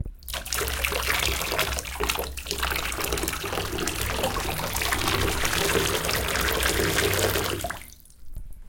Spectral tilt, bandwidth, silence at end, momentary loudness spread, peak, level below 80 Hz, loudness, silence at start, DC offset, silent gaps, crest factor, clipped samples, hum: -2.5 dB/octave; 17.5 kHz; 0 s; 8 LU; -6 dBFS; -36 dBFS; -25 LUFS; 0 s; under 0.1%; none; 22 dB; under 0.1%; none